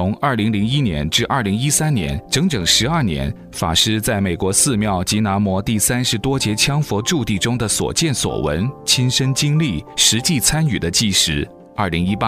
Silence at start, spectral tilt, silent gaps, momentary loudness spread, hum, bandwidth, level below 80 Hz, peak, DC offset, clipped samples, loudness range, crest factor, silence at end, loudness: 0 s; -3.5 dB/octave; none; 6 LU; none; 16 kHz; -38 dBFS; 0 dBFS; under 0.1%; under 0.1%; 2 LU; 18 dB; 0 s; -17 LUFS